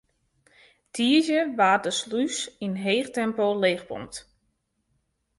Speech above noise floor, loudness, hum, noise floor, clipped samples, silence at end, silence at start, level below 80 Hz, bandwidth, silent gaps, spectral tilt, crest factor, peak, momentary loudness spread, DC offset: 50 dB; -24 LUFS; none; -74 dBFS; under 0.1%; 1.2 s; 0.95 s; -66 dBFS; 11.5 kHz; none; -3.5 dB/octave; 18 dB; -8 dBFS; 15 LU; under 0.1%